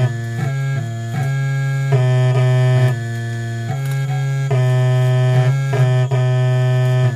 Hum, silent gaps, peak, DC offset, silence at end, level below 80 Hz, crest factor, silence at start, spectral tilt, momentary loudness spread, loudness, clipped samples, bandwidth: none; none; -4 dBFS; 0.2%; 0 s; -54 dBFS; 12 dB; 0 s; -7.5 dB/octave; 8 LU; -17 LUFS; under 0.1%; 10 kHz